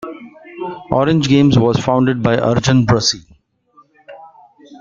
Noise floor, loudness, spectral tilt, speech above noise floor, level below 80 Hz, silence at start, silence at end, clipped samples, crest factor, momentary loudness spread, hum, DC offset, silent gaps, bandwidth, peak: -52 dBFS; -14 LUFS; -5.5 dB/octave; 39 dB; -44 dBFS; 0 s; 0.05 s; under 0.1%; 14 dB; 17 LU; none; under 0.1%; none; 7.6 kHz; -2 dBFS